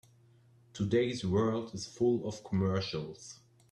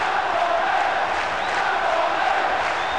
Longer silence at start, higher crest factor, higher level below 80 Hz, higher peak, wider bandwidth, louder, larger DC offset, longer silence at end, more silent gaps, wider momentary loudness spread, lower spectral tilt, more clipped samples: first, 0.75 s vs 0 s; first, 16 dB vs 10 dB; second, -66 dBFS vs -52 dBFS; second, -18 dBFS vs -12 dBFS; about the same, 10.5 kHz vs 11 kHz; second, -33 LUFS vs -21 LUFS; second, under 0.1% vs 0.8%; first, 0.35 s vs 0 s; neither; first, 15 LU vs 2 LU; first, -6.5 dB/octave vs -2.5 dB/octave; neither